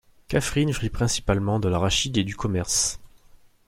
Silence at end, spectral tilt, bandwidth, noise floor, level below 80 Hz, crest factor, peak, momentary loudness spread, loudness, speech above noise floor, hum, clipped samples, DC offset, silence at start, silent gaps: 0.6 s; -4 dB/octave; 16.5 kHz; -53 dBFS; -40 dBFS; 18 dB; -6 dBFS; 5 LU; -24 LUFS; 29 dB; none; under 0.1%; under 0.1%; 0.3 s; none